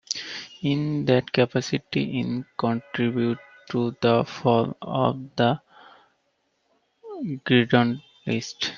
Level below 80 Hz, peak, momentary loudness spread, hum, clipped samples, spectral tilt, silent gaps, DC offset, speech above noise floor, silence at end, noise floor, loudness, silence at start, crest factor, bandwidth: -62 dBFS; -4 dBFS; 10 LU; none; under 0.1%; -6 dB/octave; none; under 0.1%; 48 dB; 0 s; -71 dBFS; -25 LUFS; 0.1 s; 22 dB; 7.6 kHz